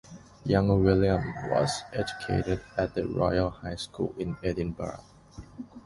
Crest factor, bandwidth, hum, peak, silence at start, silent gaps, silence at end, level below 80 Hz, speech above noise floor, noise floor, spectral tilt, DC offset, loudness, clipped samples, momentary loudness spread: 20 dB; 11.5 kHz; none; -8 dBFS; 0.05 s; none; 0.05 s; -44 dBFS; 20 dB; -48 dBFS; -6.5 dB/octave; under 0.1%; -28 LUFS; under 0.1%; 15 LU